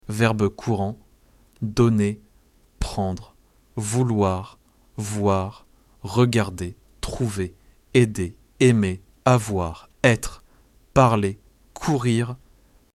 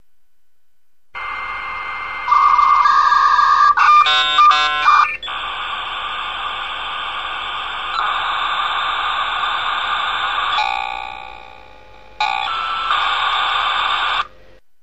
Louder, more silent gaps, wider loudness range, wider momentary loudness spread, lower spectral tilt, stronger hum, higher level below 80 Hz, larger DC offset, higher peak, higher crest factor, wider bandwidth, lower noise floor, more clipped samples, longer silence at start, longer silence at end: second, -23 LUFS vs -16 LUFS; neither; second, 5 LU vs 9 LU; first, 16 LU vs 13 LU; first, -6 dB/octave vs -0.5 dB/octave; neither; first, -42 dBFS vs -48 dBFS; second, under 0.1% vs 0.8%; about the same, -4 dBFS vs -2 dBFS; about the same, 20 dB vs 16 dB; first, 13.5 kHz vs 8.6 kHz; second, -57 dBFS vs -67 dBFS; neither; second, 0.1 s vs 1.15 s; about the same, 0.6 s vs 0.55 s